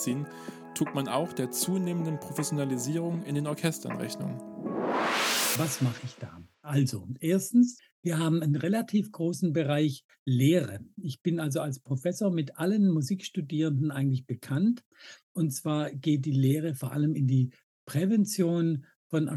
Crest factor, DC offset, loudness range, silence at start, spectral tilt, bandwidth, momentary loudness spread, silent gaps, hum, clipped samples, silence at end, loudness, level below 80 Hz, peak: 18 dB; under 0.1%; 3 LU; 0 s; -5.5 dB/octave; over 20 kHz; 11 LU; 7.92-8.03 s, 10.04-10.09 s, 10.19-10.26 s, 14.86-14.92 s, 15.23-15.35 s, 17.63-17.87 s, 18.96-19.10 s; none; under 0.1%; 0 s; -29 LUFS; -76 dBFS; -10 dBFS